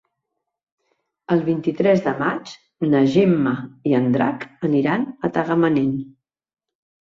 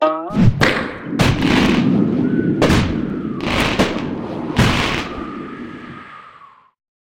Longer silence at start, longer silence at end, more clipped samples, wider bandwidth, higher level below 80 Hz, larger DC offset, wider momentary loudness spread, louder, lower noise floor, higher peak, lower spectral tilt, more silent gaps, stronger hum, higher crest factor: first, 1.3 s vs 0 s; first, 1.05 s vs 0.65 s; neither; second, 7.4 kHz vs 16.5 kHz; second, -60 dBFS vs -32 dBFS; neither; second, 9 LU vs 16 LU; second, -20 LUFS vs -17 LUFS; first, -79 dBFS vs -45 dBFS; second, -4 dBFS vs 0 dBFS; first, -8 dB/octave vs -6 dB/octave; neither; neither; about the same, 16 dB vs 18 dB